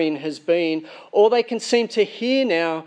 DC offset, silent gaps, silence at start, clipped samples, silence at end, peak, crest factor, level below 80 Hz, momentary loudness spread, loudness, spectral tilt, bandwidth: under 0.1%; none; 0 s; under 0.1%; 0 s; -4 dBFS; 16 dB; -82 dBFS; 7 LU; -20 LUFS; -4 dB/octave; 10 kHz